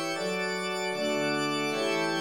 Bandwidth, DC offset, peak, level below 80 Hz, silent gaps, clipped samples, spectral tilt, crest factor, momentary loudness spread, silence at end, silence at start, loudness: 17 kHz; 0.1%; -18 dBFS; -74 dBFS; none; under 0.1%; -3.5 dB/octave; 12 dB; 2 LU; 0 s; 0 s; -29 LUFS